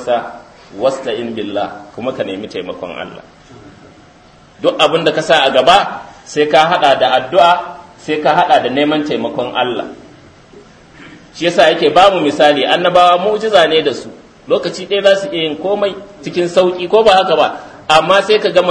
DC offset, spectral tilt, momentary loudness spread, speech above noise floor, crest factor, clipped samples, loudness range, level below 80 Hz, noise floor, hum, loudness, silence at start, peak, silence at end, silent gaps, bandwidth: under 0.1%; -4 dB/octave; 15 LU; 31 dB; 14 dB; 0.2%; 10 LU; -52 dBFS; -43 dBFS; none; -12 LUFS; 0 s; 0 dBFS; 0 s; none; 11 kHz